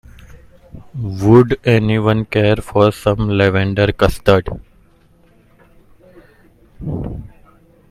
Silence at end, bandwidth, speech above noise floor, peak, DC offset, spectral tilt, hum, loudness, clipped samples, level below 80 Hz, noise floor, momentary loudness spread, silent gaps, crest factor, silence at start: 0.65 s; 14 kHz; 36 dB; 0 dBFS; under 0.1%; -7.5 dB/octave; none; -15 LUFS; under 0.1%; -34 dBFS; -50 dBFS; 18 LU; none; 16 dB; 0.75 s